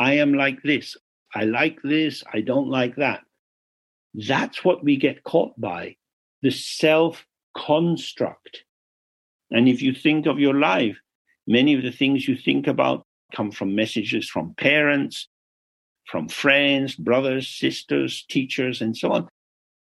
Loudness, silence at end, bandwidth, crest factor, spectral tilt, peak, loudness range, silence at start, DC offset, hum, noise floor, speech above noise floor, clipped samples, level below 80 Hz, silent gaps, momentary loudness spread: -22 LUFS; 0.55 s; 12.5 kHz; 18 dB; -5.5 dB/octave; -4 dBFS; 4 LU; 0 s; under 0.1%; none; under -90 dBFS; over 69 dB; under 0.1%; -68 dBFS; 1.01-1.26 s, 3.39-4.10 s, 6.13-6.42 s, 7.43-7.54 s, 8.69-9.40 s, 11.15-11.25 s, 13.05-13.29 s, 15.27-15.95 s; 12 LU